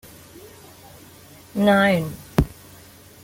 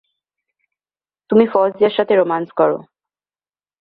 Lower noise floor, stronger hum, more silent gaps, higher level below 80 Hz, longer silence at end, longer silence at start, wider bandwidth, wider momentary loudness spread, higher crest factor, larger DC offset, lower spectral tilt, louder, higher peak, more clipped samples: second, -46 dBFS vs under -90 dBFS; neither; neither; first, -40 dBFS vs -64 dBFS; second, 0.75 s vs 1 s; first, 1.55 s vs 1.3 s; first, 17 kHz vs 4.8 kHz; first, 27 LU vs 4 LU; about the same, 22 dB vs 18 dB; neither; second, -6 dB/octave vs -9.5 dB/octave; second, -21 LUFS vs -16 LUFS; about the same, -2 dBFS vs -2 dBFS; neither